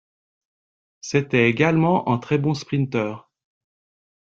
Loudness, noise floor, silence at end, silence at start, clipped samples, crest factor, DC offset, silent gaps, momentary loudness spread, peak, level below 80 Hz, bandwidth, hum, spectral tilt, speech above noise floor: -21 LUFS; under -90 dBFS; 1.1 s; 1.05 s; under 0.1%; 20 dB; under 0.1%; none; 11 LU; -4 dBFS; -60 dBFS; 7.6 kHz; none; -6.5 dB/octave; over 70 dB